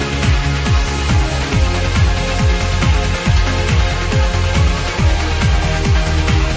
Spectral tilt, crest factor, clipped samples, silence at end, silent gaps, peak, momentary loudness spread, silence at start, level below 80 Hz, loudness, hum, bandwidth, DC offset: -5 dB/octave; 12 dB; under 0.1%; 0 s; none; -2 dBFS; 1 LU; 0 s; -16 dBFS; -16 LUFS; none; 8 kHz; under 0.1%